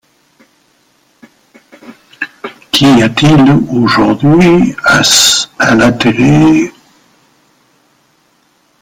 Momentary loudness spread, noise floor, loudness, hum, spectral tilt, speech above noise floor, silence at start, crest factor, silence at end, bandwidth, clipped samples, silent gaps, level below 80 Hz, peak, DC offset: 15 LU; -53 dBFS; -8 LUFS; none; -4 dB/octave; 46 dB; 1.9 s; 10 dB; 2.1 s; 19 kHz; under 0.1%; none; -40 dBFS; 0 dBFS; under 0.1%